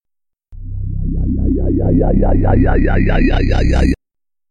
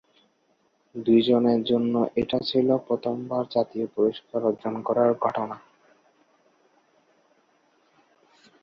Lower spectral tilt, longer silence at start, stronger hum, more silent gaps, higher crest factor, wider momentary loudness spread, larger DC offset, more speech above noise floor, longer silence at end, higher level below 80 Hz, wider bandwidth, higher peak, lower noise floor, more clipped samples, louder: about the same, -8.5 dB/octave vs -8.5 dB/octave; second, 0 s vs 0.95 s; neither; neither; second, 12 dB vs 18 dB; about the same, 11 LU vs 9 LU; neither; first, 68 dB vs 44 dB; second, 0 s vs 3.05 s; first, -16 dBFS vs -64 dBFS; first, 7.2 kHz vs 6 kHz; first, -2 dBFS vs -8 dBFS; first, -79 dBFS vs -68 dBFS; neither; first, -15 LUFS vs -24 LUFS